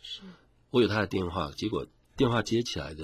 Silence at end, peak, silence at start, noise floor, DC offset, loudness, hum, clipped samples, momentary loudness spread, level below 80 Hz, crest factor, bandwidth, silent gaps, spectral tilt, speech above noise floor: 0 s; -12 dBFS; 0.05 s; -52 dBFS; under 0.1%; -29 LUFS; none; under 0.1%; 13 LU; -50 dBFS; 18 dB; 15.5 kHz; none; -5.5 dB/octave; 24 dB